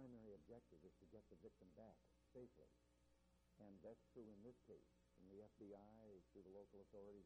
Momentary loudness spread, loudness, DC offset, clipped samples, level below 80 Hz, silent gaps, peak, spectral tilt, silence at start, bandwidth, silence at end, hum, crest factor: 5 LU; -66 LUFS; under 0.1%; under 0.1%; -82 dBFS; none; -50 dBFS; -7.5 dB/octave; 0 s; 8.2 kHz; 0 s; 60 Hz at -80 dBFS; 16 dB